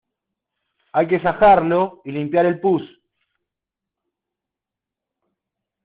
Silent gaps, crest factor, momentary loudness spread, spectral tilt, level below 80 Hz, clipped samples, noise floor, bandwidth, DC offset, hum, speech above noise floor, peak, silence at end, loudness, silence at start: none; 20 dB; 11 LU; -5.5 dB/octave; -52 dBFS; under 0.1%; -86 dBFS; 4.8 kHz; under 0.1%; none; 69 dB; -2 dBFS; 3 s; -18 LUFS; 0.95 s